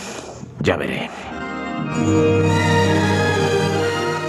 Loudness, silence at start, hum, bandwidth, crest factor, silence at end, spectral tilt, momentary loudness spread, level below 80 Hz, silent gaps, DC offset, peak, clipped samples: -19 LUFS; 0 s; none; 14 kHz; 16 dB; 0 s; -5.5 dB/octave; 13 LU; -50 dBFS; none; under 0.1%; -2 dBFS; under 0.1%